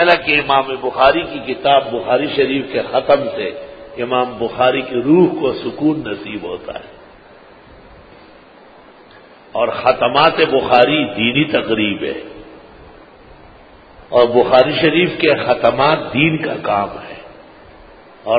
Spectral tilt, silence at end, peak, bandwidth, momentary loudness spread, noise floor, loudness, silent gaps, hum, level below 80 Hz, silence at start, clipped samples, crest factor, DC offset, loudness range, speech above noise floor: -8 dB/octave; 0 s; 0 dBFS; 5 kHz; 14 LU; -43 dBFS; -15 LUFS; none; none; -48 dBFS; 0 s; under 0.1%; 16 dB; under 0.1%; 10 LU; 28 dB